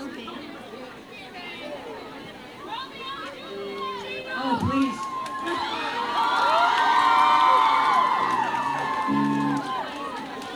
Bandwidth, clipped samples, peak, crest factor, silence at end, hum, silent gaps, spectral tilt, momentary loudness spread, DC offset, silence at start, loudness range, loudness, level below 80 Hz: over 20 kHz; under 0.1%; -8 dBFS; 16 dB; 0 s; none; none; -4.5 dB/octave; 20 LU; under 0.1%; 0 s; 16 LU; -23 LUFS; -60 dBFS